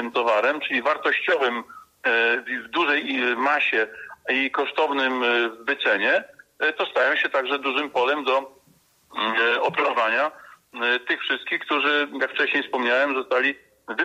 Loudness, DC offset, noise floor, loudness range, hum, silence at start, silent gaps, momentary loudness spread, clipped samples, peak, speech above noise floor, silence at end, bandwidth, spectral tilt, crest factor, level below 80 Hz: -22 LUFS; under 0.1%; -60 dBFS; 2 LU; none; 0 s; none; 5 LU; under 0.1%; -10 dBFS; 37 dB; 0 s; 15 kHz; -3.5 dB/octave; 14 dB; -74 dBFS